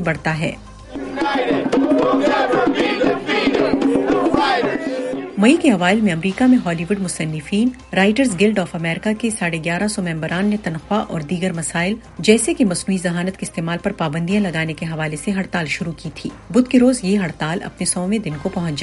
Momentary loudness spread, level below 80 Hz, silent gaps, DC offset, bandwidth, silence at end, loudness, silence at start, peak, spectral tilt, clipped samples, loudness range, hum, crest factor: 9 LU; -46 dBFS; none; under 0.1%; 11.5 kHz; 0 s; -18 LUFS; 0 s; 0 dBFS; -5 dB/octave; under 0.1%; 4 LU; none; 18 dB